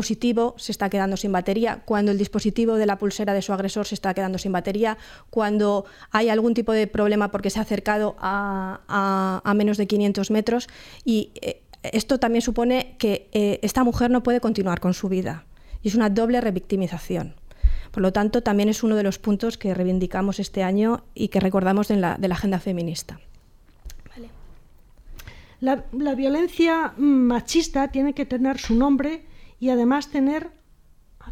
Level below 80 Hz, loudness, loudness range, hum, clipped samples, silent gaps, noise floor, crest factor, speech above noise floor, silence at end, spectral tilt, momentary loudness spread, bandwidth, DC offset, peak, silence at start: -38 dBFS; -23 LUFS; 3 LU; none; under 0.1%; none; -53 dBFS; 18 dB; 31 dB; 0 s; -6 dB/octave; 7 LU; 15.5 kHz; under 0.1%; -6 dBFS; 0 s